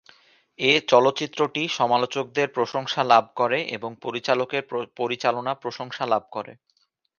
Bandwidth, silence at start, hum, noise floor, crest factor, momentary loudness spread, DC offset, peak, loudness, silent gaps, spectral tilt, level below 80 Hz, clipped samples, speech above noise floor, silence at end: 7.2 kHz; 0.6 s; none; -69 dBFS; 22 dB; 12 LU; under 0.1%; -2 dBFS; -23 LUFS; none; -4 dB/octave; -72 dBFS; under 0.1%; 46 dB; 0.65 s